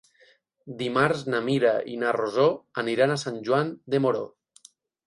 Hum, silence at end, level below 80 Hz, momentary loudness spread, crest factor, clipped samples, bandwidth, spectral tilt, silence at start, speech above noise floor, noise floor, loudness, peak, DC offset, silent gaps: none; 0.8 s; -70 dBFS; 8 LU; 20 dB; under 0.1%; 11.5 kHz; -6 dB/octave; 0.65 s; 36 dB; -61 dBFS; -25 LUFS; -6 dBFS; under 0.1%; none